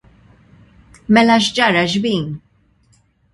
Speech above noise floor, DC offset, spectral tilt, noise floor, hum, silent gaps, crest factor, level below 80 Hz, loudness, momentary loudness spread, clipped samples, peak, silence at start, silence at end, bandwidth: 42 dB; under 0.1%; -4.5 dB/octave; -57 dBFS; none; none; 18 dB; -52 dBFS; -14 LUFS; 19 LU; under 0.1%; 0 dBFS; 1.1 s; 0.95 s; 11.5 kHz